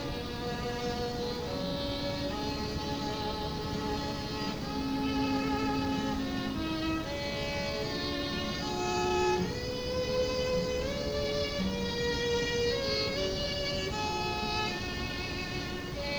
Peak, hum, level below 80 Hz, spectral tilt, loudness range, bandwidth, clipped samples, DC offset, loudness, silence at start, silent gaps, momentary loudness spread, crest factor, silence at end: -18 dBFS; none; -44 dBFS; -4.5 dB/octave; 3 LU; over 20 kHz; under 0.1%; under 0.1%; -32 LUFS; 0 s; none; 5 LU; 14 dB; 0 s